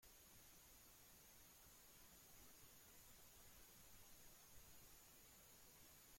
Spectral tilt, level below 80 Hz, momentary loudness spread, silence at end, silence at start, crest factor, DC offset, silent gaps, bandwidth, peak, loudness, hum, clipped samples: -2 dB/octave; -76 dBFS; 1 LU; 0 s; 0 s; 14 dB; under 0.1%; none; 16.5 kHz; -52 dBFS; -65 LUFS; none; under 0.1%